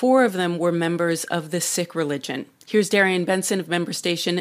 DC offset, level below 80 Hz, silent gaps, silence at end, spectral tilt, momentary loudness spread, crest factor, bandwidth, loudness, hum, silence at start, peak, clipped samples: under 0.1%; -74 dBFS; none; 0 s; -4 dB/octave; 8 LU; 18 dB; 16 kHz; -22 LUFS; none; 0 s; -4 dBFS; under 0.1%